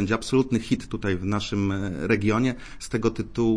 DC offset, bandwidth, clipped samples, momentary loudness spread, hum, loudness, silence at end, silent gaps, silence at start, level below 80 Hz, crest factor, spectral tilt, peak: under 0.1%; 10.5 kHz; under 0.1%; 5 LU; none; -25 LUFS; 0 s; none; 0 s; -44 dBFS; 16 dB; -6 dB/octave; -8 dBFS